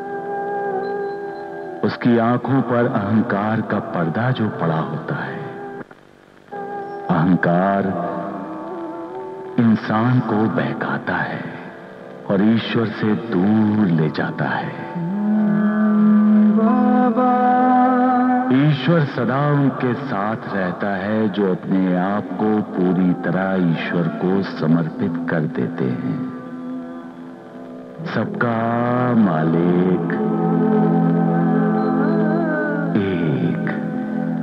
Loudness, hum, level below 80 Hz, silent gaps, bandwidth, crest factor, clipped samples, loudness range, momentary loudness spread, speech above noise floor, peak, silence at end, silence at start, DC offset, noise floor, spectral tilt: -19 LUFS; none; -62 dBFS; none; 5.8 kHz; 14 dB; under 0.1%; 7 LU; 14 LU; 29 dB; -4 dBFS; 0 s; 0 s; under 0.1%; -47 dBFS; -9.5 dB/octave